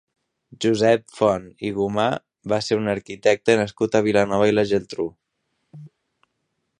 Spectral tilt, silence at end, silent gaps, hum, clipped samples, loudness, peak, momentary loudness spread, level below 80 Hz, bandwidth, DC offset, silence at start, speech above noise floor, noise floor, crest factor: -5.5 dB/octave; 0.95 s; none; none; under 0.1%; -21 LUFS; -2 dBFS; 9 LU; -56 dBFS; 10.5 kHz; under 0.1%; 0.6 s; 54 dB; -75 dBFS; 20 dB